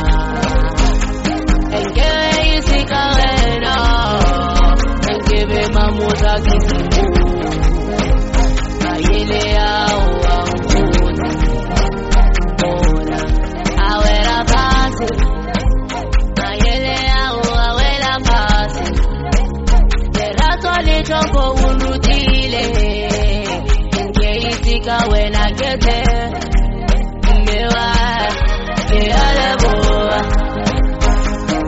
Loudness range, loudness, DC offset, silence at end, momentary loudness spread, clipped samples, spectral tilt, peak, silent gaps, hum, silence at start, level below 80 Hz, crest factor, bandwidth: 2 LU; -16 LUFS; under 0.1%; 0 s; 4 LU; under 0.1%; -5 dB/octave; 0 dBFS; none; none; 0 s; -14 dBFS; 12 dB; 8 kHz